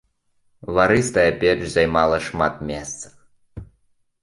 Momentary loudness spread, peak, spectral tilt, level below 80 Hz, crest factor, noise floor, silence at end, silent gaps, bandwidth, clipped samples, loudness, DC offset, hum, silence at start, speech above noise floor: 16 LU; -2 dBFS; -5 dB/octave; -44 dBFS; 20 dB; -64 dBFS; 0.6 s; none; 11.5 kHz; under 0.1%; -19 LUFS; under 0.1%; none; 0.7 s; 45 dB